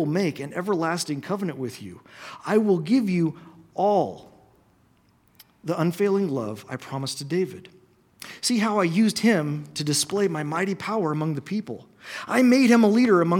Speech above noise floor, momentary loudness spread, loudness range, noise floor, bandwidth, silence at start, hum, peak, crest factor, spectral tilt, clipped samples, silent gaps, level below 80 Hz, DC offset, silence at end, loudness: 38 dB; 19 LU; 5 LU; -61 dBFS; 17.5 kHz; 0 s; none; -6 dBFS; 18 dB; -5.5 dB/octave; under 0.1%; none; -70 dBFS; under 0.1%; 0 s; -23 LUFS